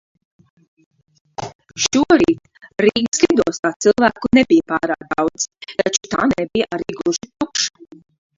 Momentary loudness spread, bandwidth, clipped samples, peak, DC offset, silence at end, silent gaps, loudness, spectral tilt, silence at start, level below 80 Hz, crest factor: 12 LU; 7.8 kHz; under 0.1%; 0 dBFS; under 0.1%; 0.7 s; 1.55-1.59 s, 3.08-3.12 s, 3.59-3.63 s, 3.76-3.80 s; -17 LUFS; -3.5 dB/octave; 1.4 s; -50 dBFS; 18 dB